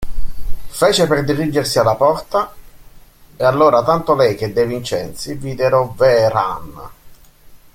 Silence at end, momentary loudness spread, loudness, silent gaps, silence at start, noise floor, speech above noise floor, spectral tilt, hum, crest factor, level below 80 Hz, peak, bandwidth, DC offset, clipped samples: 0.2 s; 17 LU; -16 LUFS; none; 0 s; -42 dBFS; 27 dB; -5 dB/octave; none; 14 dB; -34 dBFS; -2 dBFS; 16.5 kHz; under 0.1%; under 0.1%